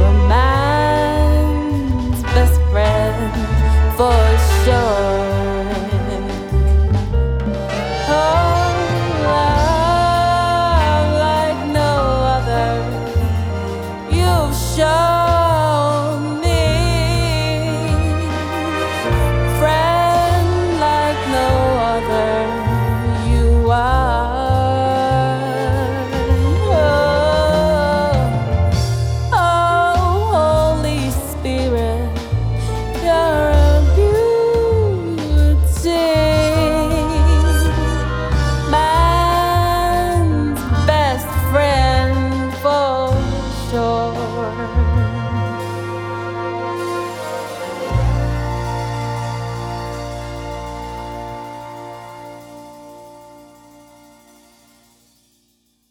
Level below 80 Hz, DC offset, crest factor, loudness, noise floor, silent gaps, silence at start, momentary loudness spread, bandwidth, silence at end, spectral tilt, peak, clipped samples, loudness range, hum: -22 dBFS; under 0.1%; 14 dB; -16 LUFS; -62 dBFS; none; 0 s; 9 LU; 16 kHz; 2.65 s; -6 dB/octave; -2 dBFS; under 0.1%; 7 LU; none